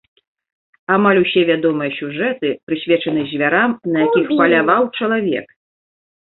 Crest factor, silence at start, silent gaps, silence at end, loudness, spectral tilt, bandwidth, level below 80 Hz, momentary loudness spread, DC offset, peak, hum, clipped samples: 16 dB; 0.9 s; 2.63-2.67 s; 0.85 s; -16 LUFS; -10.5 dB/octave; 4.2 kHz; -60 dBFS; 9 LU; under 0.1%; -2 dBFS; none; under 0.1%